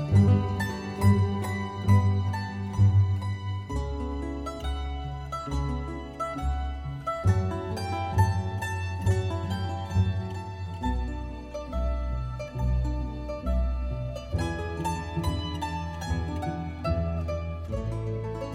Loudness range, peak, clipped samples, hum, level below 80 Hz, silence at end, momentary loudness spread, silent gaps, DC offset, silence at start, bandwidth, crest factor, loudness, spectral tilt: 6 LU; -10 dBFS; under 0.1%; none; -36 dBFS; 0 s; 11 LU; none; under 0.1%; 0 s; 11.5 kHz; 18 dB; -29 LUFS; -7 dB/octave